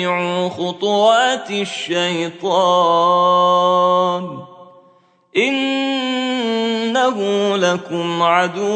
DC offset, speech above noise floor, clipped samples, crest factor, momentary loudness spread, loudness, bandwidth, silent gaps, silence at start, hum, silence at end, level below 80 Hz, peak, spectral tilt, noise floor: under 0.1%; 37 dB; under 0.1%; 16 dB; 8 LU; -16 LUFS; 9 kHz; none; 0 s; none; 0 s; -68 dBFS; -2 dBFS; -4.5 dB/octave; -53 dBFS